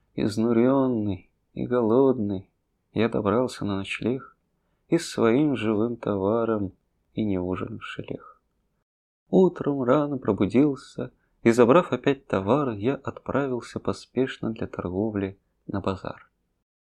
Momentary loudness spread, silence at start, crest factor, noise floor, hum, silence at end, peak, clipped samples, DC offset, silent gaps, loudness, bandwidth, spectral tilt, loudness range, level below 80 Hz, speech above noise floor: 14 LU; 0.15 s; 20 dB; -72 dBFS; none; 0.7 s; -4 dBFS; under 0.1%; under 0.1%; 8.82-9.26 s; -25 LUFS; 12.5 kHz; -7 dB/octave; 7 LU; -58 dBFS; 48 dB